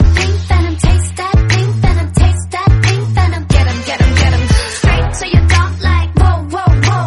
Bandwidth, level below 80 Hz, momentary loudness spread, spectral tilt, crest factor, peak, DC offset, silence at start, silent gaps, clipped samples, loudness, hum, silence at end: 11.5 kHz; -16 dBFS; 3 LU; -5.5 dB/octave; 10 dB; 0 dBFS; under 0.1%; 0 s; none; under 0.1%; -12 LUFS; none; 0 s